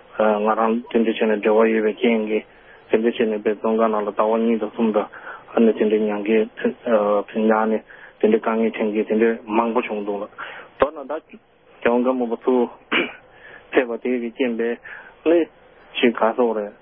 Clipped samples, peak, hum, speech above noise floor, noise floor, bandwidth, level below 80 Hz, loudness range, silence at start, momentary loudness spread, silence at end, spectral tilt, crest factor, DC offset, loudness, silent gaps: under 0.1%; -2 dBFS; none; 25 dB; -45 dBFS; 3.8 kHz; -60 dBFS; 3 LU; 0.15 s; 8 LU; 0.1 s; -10.5 dB/octave; 20 dB; under 0.1%; -21 LUFS; none